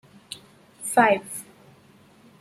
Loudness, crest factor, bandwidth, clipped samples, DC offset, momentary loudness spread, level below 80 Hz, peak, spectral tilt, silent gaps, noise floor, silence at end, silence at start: -22 LUFS; 22 dB; 15.5 kHz; under 0.1%; under 0.1%; 21 LU; -72 dBFS; -6 dBFS; -3 dB/octave; none; -54 dBFS; 1 s; 0.8 s